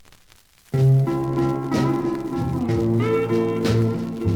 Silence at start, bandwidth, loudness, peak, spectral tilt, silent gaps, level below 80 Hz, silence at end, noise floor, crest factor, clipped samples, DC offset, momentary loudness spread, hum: 0.75 s; 15.5 kHz; -21 LUFS; -8 dBFS; -8 dB/octave; none; -44 dBFS; 0 s; -53 dBFS; 12 dB; under 0.1%; under 0.1%; 7 LU; none